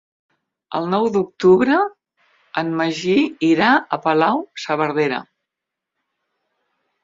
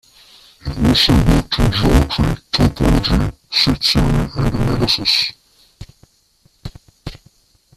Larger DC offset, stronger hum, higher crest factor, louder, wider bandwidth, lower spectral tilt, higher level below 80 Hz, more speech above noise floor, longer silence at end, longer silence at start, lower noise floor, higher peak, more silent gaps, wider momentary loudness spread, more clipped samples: neither; neither; about the same, 18 dB vs 16 dB; second, -18 LUFS vs -15 LUFS; second, 7.8 kHz vs 14.5 kHz; about the same, -6 dB/octave vs -5.5 dB/octave; second, -62 dBFS vs -24 dBFS; first, 66 dB vs 42 dB; first, 1.8 s vs 0.6 s; about the same, 0.7 s vs 0.65 s; first, -83 dBFS vs -56 dBFS; about the same, -2 dBFS vs 0 dBFS; neither; second, 11 LU vs 22 LU; neither